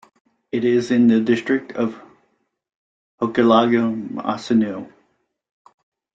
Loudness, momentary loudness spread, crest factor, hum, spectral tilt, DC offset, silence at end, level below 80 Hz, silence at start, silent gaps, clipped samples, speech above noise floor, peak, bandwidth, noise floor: -19 LUFS; 11 LU; 18 dB; none; -6.5 dB/octave; under 0.1%; 1.3 s; -62 dBFS; 0.55 s; 2.75-3.18 s; under 0.1%; 48 dB; -2 dBFS; 7.8 kHz; -66 dBFS